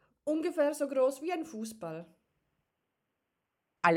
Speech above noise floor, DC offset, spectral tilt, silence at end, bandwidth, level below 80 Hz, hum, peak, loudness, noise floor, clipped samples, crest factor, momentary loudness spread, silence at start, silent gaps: 52 dB; under 0.1%; -5 dB/octave; 0 s; 17 kHz; -82 dBFS; none; -12 dBFS; -33 LUFS; -85 dBFS; under 0.1%; 22 dB; 13 LU; 0.25 s; none